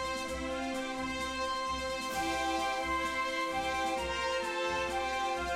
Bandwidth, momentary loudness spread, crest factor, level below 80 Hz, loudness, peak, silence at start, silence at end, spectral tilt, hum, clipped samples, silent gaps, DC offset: 16 kHz; 4 LU; 12 dB; -52 dBFS; -33 LUFS; -22 dBFS; 0 s; 0 s; -3 dB/octave; none; under 0.1%; none; under 0.1%